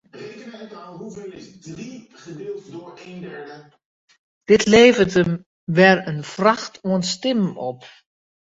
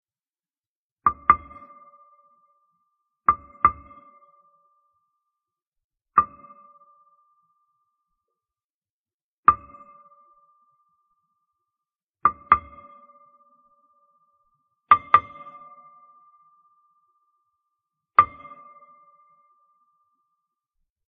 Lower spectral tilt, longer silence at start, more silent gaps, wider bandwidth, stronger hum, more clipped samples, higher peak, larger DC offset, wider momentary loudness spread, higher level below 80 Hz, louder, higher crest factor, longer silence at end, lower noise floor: first, -5 dB/octave vs -2.5 dB/octave; second, 0.15 s vs 1.05 s; second, 3.85-4.08 s, 4.19-4.41 s, 5.46-5.67 s vs 5.67-5.72 s, 5.84-5.90 s, 8.64-8.82 s, 8.90-9.04 s, 9.14-9.43 s, 12.10-12.14 s; first, 8 kHz vs 4 kHz; neither; neither; about the same, 0 dBFS vs 0 dBFS; neither; about the same, 25 LU vs 25 LU; about the same, -54 dBFS vs -58 dBFS; first, -18 LUFS vs -22 LUFS; second, 20 dB vs 28 dB; second, 0.8 s vs 2.85 s; second, -38 dBFS vs under -90 dBFS